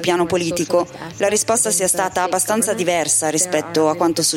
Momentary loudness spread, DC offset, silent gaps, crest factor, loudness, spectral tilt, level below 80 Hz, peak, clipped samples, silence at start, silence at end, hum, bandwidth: 4 LU; under 0.1%; none; 14 dB; -17 LUFS; -2.5 dB/octave; -56 dBFS; -4 dBFS; under 0.1%; 0 s; 0 s; none; 17 kHz